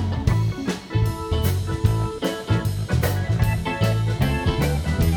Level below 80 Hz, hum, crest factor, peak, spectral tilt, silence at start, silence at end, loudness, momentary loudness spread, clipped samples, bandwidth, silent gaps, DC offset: -32 dBFS; none; 16 dB; -6 dBFS; -6.5 dB/octave; 0 s; 0 s; -23 LUFS; 3 LU; under 0.1%; 18 kHz; none; under 0.1%